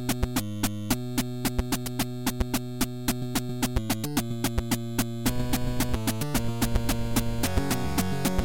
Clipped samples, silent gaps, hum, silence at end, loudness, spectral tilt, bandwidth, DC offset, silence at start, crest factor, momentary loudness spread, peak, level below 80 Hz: under 0.1%; none; none; 0 s; -29 LUFS; -4.5 dB/octave; 17 kHz; 0.8%; 0 s; 18 dB; 3 LU; -10 dBFS; -36 dBFS